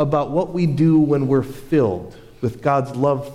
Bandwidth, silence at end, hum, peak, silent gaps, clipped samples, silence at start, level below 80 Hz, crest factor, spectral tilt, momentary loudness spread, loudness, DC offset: 14 kHz; 0 s; none; -6 dBFS; none; under 0.1%; 0 s; -46 dBFS; 12 dB; -9 dB/octave; 11 LU; -19 LUFS; under 0.1%